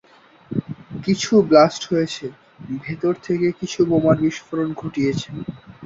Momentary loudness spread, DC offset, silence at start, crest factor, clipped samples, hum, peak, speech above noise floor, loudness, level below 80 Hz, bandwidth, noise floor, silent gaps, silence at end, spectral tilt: 17 LU; under 0.1%; 0.5 s; 18 dB; under 0.1%; none; -2 dBFS; 27 dB; -20 LUFS; -54 dBFS; 7.8 kHz; -46 dBFS; none; 0 s; -6 dB/octave